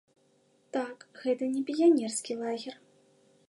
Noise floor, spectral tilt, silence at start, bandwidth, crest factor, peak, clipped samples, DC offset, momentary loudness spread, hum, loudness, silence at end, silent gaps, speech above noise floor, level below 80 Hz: -68 dBFS; -3.5 dB/octave; 0.75 s; 11.5 kHz; 18 dB; -12 dBFS; under 0.1%; under 0.1%; 14 LU; none; -30 LUFS; 0.75 s; none; 39 dB; -88 dBFS